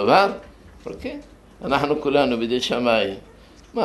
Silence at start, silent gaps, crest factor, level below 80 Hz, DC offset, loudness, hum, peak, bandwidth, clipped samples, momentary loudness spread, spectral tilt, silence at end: 0 s; none; 20 dB; -50 dBFS; under 0.1%; -21 LUFS; none; -2 dBFS; 12 kHz; under 0.1%; 19 LU; -5 dB/octave; 0 s